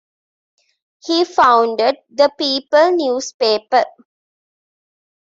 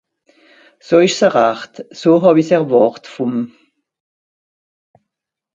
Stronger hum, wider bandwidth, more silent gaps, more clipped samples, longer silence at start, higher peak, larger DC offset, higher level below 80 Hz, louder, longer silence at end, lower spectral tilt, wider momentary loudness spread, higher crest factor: neither; about the same, 7.8 kHz vs 7.8 kHz; first, 3.34-3.40 s vs none; neither; first, 1.05 s vs 0.9 s; about the same, 0 dBFS vs 0 dBFS; neither; about the same, -64 dBFS vs -64 dBFS; about the same, -15 LUFS vs -14 LUFS; second, 1.35 s vs 2.1 s; second, -2 dB/octave vs -5.5 dB/octave; second, 8 LU vs 13 LU; about the same, 16 dB vs 16 dB